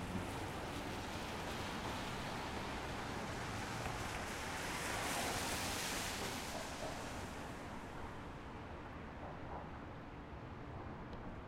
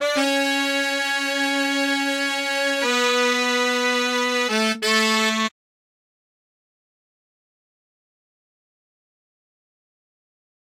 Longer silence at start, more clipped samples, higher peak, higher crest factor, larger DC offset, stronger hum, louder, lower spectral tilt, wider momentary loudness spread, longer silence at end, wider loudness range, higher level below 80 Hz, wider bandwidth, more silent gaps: about the same, 0 s vs 0 s; neither; second, -26 dBFS vs -6 dBFS; about the same, 18 dB vs 18 dB; neither; neither; second, -44 LUFS vs -20 LUFS; first, -3.5 dB/octave vs -1.5 dB/octave; first, 11 LU vs 3 LU; second, 0 s vs 5.15 s; first, 9 LU vs 6 LU; first, -56 dBFS vs -76 dBFS; about the same, 16 kHz vs 16 kHz; neither